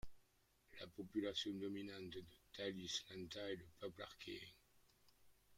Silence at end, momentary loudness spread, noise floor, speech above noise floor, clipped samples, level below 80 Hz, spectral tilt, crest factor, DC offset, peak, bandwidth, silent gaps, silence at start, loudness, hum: 0 s; 13 LU; -77 dBFS; 28 dB; under 0.1%; -72 dBFS; -4 dB/octave; 20 dB; under 0.1%; -30 dBFS; 16.5 kHz; none; 0.05 s; -49 LUFS; none